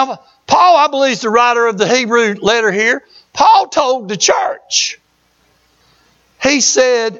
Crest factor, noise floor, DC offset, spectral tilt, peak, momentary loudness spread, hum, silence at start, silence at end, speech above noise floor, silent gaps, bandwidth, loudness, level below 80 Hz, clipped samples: 14 dB; -57 dBFS; under 0.1%; -2 dB/octave; 0 dBFS; 8 LU; none; 0 s; 0 s; 44 dB; none; 8 kHz; -12 LUFS; -54 dBFS; under 0.1%